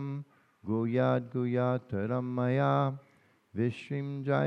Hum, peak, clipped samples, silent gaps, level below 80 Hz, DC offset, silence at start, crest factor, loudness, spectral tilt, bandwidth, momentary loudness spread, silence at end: none; -14 dBFS; under 0.1%; none; -76 dBFS; under 0.1%; 0 s; 18 dB; -31 LUFS; -9.5 dB/octave; 6.2 kHz; 12 LU; 0 s